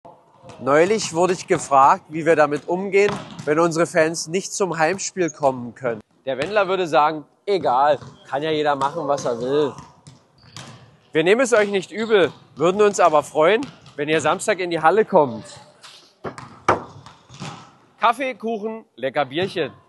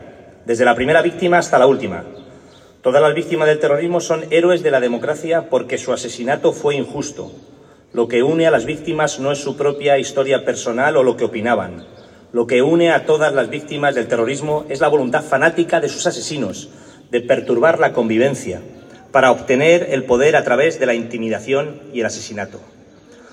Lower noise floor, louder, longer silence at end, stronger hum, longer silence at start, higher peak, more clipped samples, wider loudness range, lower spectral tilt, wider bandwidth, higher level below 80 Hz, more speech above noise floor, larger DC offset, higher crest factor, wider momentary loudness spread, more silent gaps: first, -49 dBFS vs -44 dBFS; second, -20 LUFS vs -16 LUFS; second, 0.15 s vs 0.7 s; neither; about the same, 0.05 s vs 0 s; about the same, -2 dBFS vs 0 dBFS; neither; first, 6 LU vs 3 LU; about the same, -4.5 dB/octave vs -4.5 dB/octave; about the same, 12 kHz vs 11.5 kHz; second, -64 dBFS vs -56 dBFS; about the same, 29 dB vs 28 dB; neither; about the same, 18 dB vs 16 dB; about the same, 13 LU vs 12 LU; neither